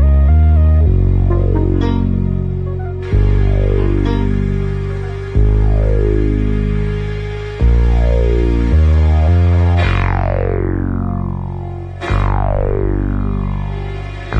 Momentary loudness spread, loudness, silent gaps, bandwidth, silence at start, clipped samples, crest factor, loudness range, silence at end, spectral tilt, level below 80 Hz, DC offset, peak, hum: 10 LU; -15 LUFS; none; 5.8 kHz; 0 s; under 0.1%; 10 dB; 4 LU; 0 s; -9.5 dB/octave; -16 dBFS; under 0.1%; -2 dBFS; none